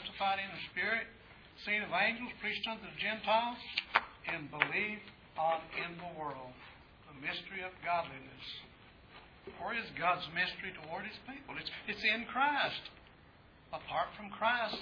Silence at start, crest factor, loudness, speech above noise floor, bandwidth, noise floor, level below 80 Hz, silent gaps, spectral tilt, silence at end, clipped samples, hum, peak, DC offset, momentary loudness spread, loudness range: 0 s; 30 dB; -36 LUFS; 23 dB; 5.4 kHz; -61 dBFS; -66 dBFS; none; -5 dB/octave; 0 s; under 0.1%; none; -8 dBFS; under 0.1%; 16 LU; 7 LU